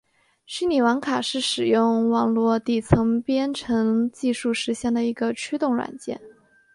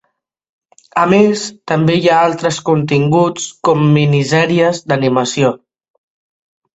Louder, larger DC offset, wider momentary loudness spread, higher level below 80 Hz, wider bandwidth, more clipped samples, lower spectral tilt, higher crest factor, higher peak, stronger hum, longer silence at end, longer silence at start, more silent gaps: second, -23 LUFS vs -13 LUFS; neither; about the same, 7 LU vs 6 LU; first, -48 dBFS vs -54 dBFS; first, 11.5 kHz vs 8.2 kHz; neither; about the same, -5.5 dB/octave vs -6 dB/octave; first, 20 dB vs 14 dB; about the same, -2 dBFS vs 0 dBFS; neither; second, 0.45 s vs 1.2 s; second, 0.5 s vs 0.95 s; neither